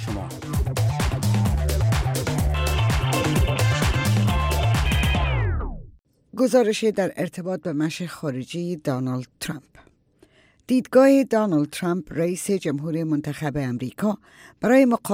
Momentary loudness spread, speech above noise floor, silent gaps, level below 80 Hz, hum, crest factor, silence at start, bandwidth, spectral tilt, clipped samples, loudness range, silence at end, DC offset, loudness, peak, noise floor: 11 LU; 36 dB; none; -32 dBFS; none; 18 dB; 0 s; 17 kHz; -6 dB/octave; under 0.1%; 5 LU; 0 s; under 0.1%; -23 LUFS; -4 dBFS; -58 dBFS